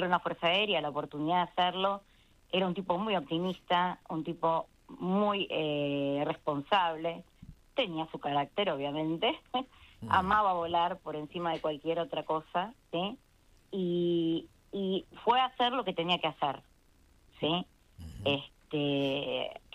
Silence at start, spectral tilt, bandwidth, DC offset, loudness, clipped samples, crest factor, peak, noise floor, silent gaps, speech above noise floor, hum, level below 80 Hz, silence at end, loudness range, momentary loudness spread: 0 s; -6.5 dB/octave; 12.5 kHz; under 0.1%; -32 LUFS; under 0.1%; 20 dB; -12 dBFS; -64 dBFS; none; 32 dB; none; -64 dBFS; 0.15 s; 3 LU; 10 LU